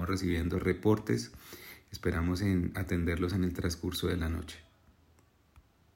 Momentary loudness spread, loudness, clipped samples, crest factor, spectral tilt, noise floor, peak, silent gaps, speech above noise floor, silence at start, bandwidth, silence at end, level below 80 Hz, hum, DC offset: 17 LU; -32 LUFS; under 0.1%; 18 dB; -6 dB/octave; -65 dBFS; -14 dBFS; none; 34 dB; 0 s; 16.5 kHz; 1.35 s; -46 dBFS; none; under 0.1%